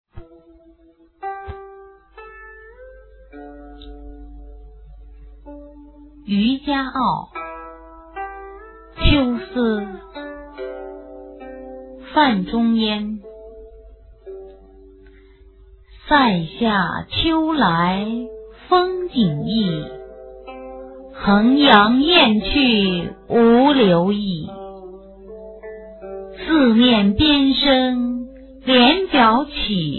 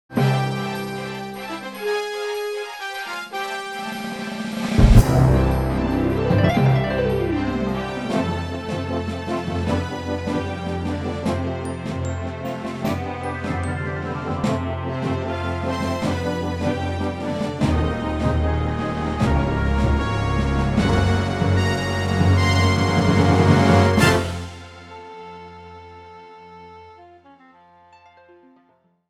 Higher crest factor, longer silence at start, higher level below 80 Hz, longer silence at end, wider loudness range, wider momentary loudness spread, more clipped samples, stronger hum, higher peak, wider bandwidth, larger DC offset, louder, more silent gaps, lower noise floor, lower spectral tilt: about the same, 20 dB vs 22 dB; about the same, 0.15 s vs 0.1 s; second, -36 dBFS vs -30 dBFS; second, 0 s vs 2.05 s; about the same, 11 LU vs 9 LU; first, 25 LU vs 14 LU; neither; neither; about the same, 0 dBFS vs 0 dBFS; second, 4.4 kHz vs 14.5 kHz; neither; first, -17 LUFS vs -22 LUFS; neither; second, -53 dBFS vs -61 dBFS; first, -8.5 dB/octave vs -6.5 dB/octave